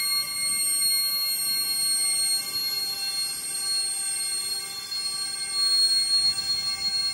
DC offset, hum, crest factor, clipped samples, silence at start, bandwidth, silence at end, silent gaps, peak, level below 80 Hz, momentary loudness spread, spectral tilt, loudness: under 0.1%; none; 12 dB; under 0.1%; 0 s; 16 kHz; 0 s; none; -14 dBFS; -64 dBFS; 8 LU; 2.5 dB/octave; -23 LUFS